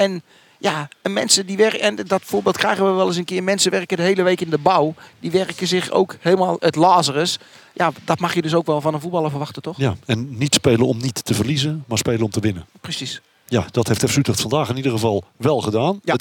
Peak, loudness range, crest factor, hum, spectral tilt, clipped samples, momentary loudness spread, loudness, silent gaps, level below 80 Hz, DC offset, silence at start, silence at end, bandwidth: 0 dBFS; 3 LU; 20 dB; none; -4.5 dB/octave; under 0.1%; 8 LU; -19 LUFS; none; -58 dBFS; under 0.1%; 0 s; 0 s; 18 kHz